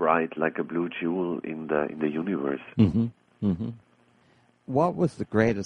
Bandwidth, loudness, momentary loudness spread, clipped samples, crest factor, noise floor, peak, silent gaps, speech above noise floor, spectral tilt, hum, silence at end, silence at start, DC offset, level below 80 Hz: 10 kHz; -27 LUFS; 7 LU; under 0.1%; 20 dB; -62 dBFS; -6 dBFS; none; 36 dB; -8.5 dB/octave; none; 0 s; 0 s; under 0.1%; -56 dBFS